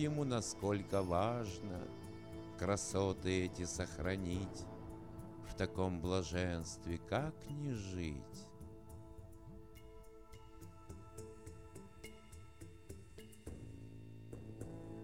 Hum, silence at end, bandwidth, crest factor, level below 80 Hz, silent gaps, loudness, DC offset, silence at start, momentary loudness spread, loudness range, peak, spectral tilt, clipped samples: none; 0 s; 16.5 kHz; 22 dB; -58 dBFS; none; -41 LUFS; under 0.1%; 0 s; 20 LU; 17 LU; -22 dBFS; -5.5 dB/octave; under 0.1%